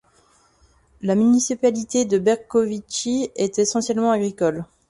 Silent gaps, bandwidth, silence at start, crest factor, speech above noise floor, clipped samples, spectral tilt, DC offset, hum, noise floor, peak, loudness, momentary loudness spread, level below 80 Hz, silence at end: none; 11.5 kHz; 1 s; 16 dB; 38 dB; under 0.1%; -4.5 dB/octave; under 0.1%; none; -58 dBFS; -6 dBFS; -21 LUFS; 6 LU; -58 dBFS; 0.25 s